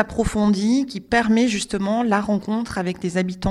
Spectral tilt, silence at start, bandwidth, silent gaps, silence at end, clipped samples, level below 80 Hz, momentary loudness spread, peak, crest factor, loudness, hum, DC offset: -5.5 dB/octave; 0 s; 12 kHz; none; 0 s; under 0.1%; -40 dBFS; 6 LU; -4 dBFS; 16 dB; -21 LUFS; none; under 0.1%